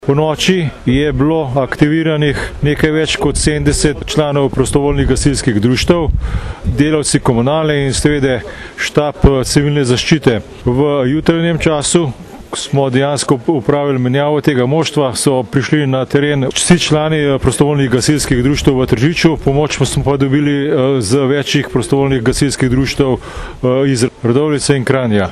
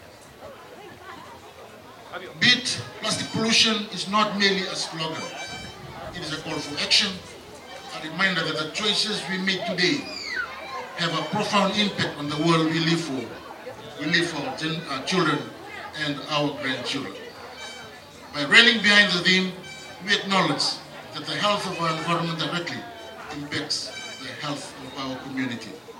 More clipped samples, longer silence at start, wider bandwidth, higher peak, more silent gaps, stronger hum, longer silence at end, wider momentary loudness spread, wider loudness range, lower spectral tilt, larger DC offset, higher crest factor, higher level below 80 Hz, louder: neither; about the same, 0 s vs 0 s; second, 13 kHz vs 17 kHz; about the same, 0 dBFS vs -2 dBFS; neither; neither; about the same, 0 s vs 0 s; second, 4 LU vs 21 LU; second, 2 LU vs 8 LU; first, -5.5 dB/octave vs -3 dB/octave; neither; second, 12 dB vs 24 dB; first, -28 dBFS vs -62 dBFS; first, -13 LUFS vs -23 LUFS